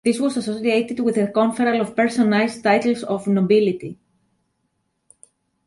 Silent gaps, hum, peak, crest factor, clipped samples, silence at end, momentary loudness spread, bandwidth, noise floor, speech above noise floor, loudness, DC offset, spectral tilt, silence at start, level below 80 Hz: none; none; -4 dBFS; 16 dB; under 0.1%; 1.7 s; 6 LU; 11.5 kHz; -71 dBFS; 52 dB; -19 LUFS; under 0.1%; -6 dB/octave; 0.05 s; -64 dBFS